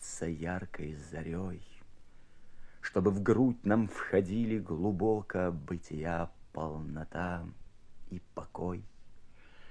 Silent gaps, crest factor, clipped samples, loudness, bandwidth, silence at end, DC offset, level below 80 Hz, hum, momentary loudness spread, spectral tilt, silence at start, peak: none; 22 dB; under 0.1%; -34 LUFS; 11 kHz; 0 s; under 0.1%; -54 dBFS; none; 15 LU; -7 dB/octave; 0 s; -14 dBFS